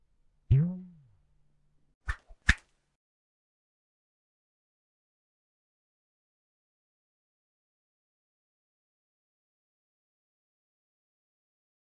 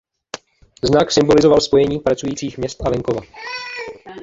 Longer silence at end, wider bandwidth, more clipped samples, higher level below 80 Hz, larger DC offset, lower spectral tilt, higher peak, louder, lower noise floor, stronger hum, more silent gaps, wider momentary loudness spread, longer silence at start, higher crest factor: first, 9.45 s vs 0 s; first, 10 kHz vs 7.8 kHz; neither; about the same, -46 dBFS vs -42 dBFS; neither; about the same, -5.5 dB/octave vs -5 dB/octave; second, -6 dBFS vs -2 dBFS; second, -30 LUFS vs -17 LUFS; first, -67 dBFS vs -37 dBFS; neither; first, 1.94-2.01 s vs none; second, 16 LU vs 20 LU; first, 0.5 s vs 0.35 s; first, 34 dB vs 16 dB